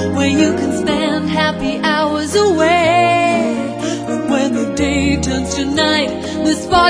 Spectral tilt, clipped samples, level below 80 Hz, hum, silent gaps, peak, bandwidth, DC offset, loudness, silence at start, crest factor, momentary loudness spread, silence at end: -4.5 dB/octave; under 0.1%; -36 dBFS; none; none; 0 dBFS; 11 kHz; under 0.1%; -15 LUFS; 0 s; 14 dB; 7 LU; 0 s